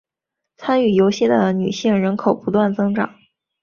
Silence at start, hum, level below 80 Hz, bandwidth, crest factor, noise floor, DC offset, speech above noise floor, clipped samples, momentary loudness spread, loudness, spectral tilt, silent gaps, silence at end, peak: 0.6 s; none; -58 dBFS; 7.2 kHz; 16 dB; -82 dBFS; under 0.1%; 65 dB; under 0.1%; 6 LU; -18 LUFS; -6.5 dB/octave; none; 0.55 s; -2 dBFS